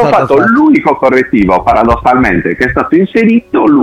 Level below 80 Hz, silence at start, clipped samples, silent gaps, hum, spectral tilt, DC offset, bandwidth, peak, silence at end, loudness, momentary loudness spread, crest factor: -30 dBFS; 0 s; under 0.1%; none; none; -8 dB/octave; under 0.1%; 9 kHz; 0 dBFS; 0 s; -8 LUFS; 3 LU; 8 dB